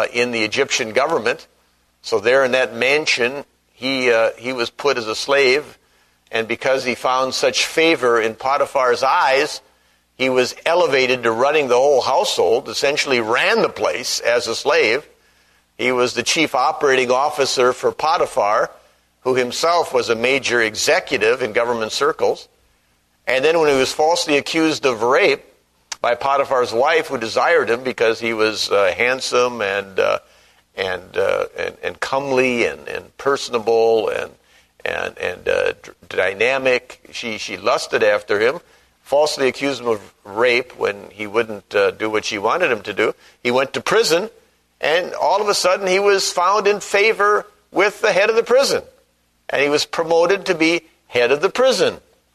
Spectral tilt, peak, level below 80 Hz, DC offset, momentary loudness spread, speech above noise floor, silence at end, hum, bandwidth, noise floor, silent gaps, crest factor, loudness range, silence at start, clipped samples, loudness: -2.5 dB/octave; 0 dBFS; -58 dBFS; under 0.1%; 9 LU; 43 dB; 0.35 s; 60 Hz at -55 dBFS; 13.5 kHz; -61 dBFS; none; 18 dB; 3 LU; 0 s; under 0.1%; -18 LUFS